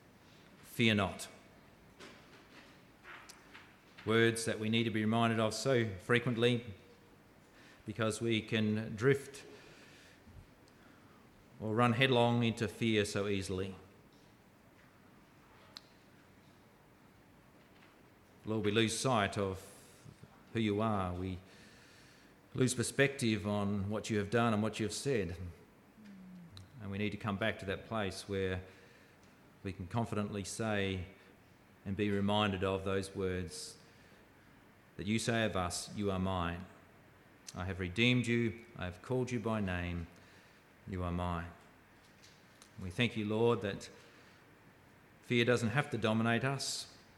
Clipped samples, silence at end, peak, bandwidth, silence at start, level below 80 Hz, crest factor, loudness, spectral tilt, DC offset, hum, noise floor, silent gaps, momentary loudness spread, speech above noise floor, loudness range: under 0.1%; 0.2 s; -14 dBFS; 15.5 kHz; 0.6 s; -64 dBFS; 22 dB; -35 LUFS; -5 dB/octave; under 0.1%; none; -63 dBFS; none; 23 LU; 28 dB; 7 LU